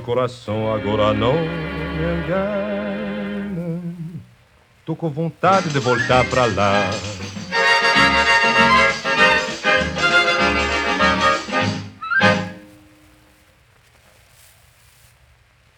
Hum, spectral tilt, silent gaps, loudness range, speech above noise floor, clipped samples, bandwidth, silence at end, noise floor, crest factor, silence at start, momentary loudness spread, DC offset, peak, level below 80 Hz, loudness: none; -4.5 dB/octave; none; 10 LU; 35 dB; under 0.1%; 17.5 kHz; 3.1 s; -54 dBFS; 18 dB; 0 s; 13 LU; under 0.1%; 0 dBFS; -40 dBFS; -17 LUFS